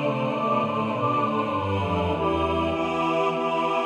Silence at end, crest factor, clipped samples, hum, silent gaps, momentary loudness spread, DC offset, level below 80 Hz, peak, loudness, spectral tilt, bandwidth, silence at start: 0 s; 12 dB; under 0.1%; none; none; 2 LU; under 0.1%; -46 dBFS; -12 dBFS; -24 LUFS; -7 dB/octave; 11.5 kHz; 0 s